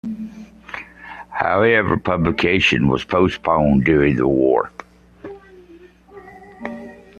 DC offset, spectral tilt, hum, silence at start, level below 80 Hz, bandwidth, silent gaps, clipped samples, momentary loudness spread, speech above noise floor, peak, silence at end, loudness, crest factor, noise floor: under 0.1%; -6.5 dB/octave; none; 0.05 s; -42 dBFS; 8.8 kHz; none; under 0.1%; 20 LU; 29 dB; -2 dBFS; 0.25 s; -17 LUFS; 16 dB; -45 dBFS